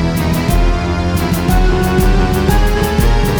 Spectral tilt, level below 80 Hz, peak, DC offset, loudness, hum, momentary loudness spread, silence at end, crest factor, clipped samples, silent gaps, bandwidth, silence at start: -6 dB/octave; -14 dBFS; 0 dBFS; under 0.1%; -14 LUFS; none; 3 LU; 0 s; 12 dB; under 0.1%; none; over 20 kHz; 0 s